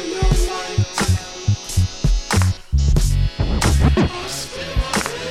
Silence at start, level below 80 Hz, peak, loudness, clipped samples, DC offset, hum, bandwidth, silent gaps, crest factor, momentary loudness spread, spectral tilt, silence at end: 0 s; -22 dBFS; -2 dBFS; -20 LUFS; under 0.1%; under 0.1%; none; 15 kHz; none; 16 dB; 6 LU; -5 dB/octave; 0 s